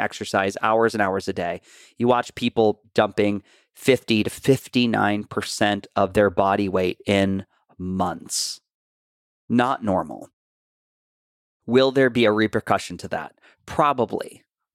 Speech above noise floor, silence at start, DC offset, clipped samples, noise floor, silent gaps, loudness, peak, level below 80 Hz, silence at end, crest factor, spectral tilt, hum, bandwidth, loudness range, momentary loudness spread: over 68 dB; 0 s; under 0.1%; under 0.1%; under -90 dBFS; 8.72-9.48 s, 10.33-11.60 s; -22 LUFS; -4 dBFS; -56 dBFS; 0.45 s; 20 dB; -5 dB/octave; none; 16 kHz; 5 LU; 11 LU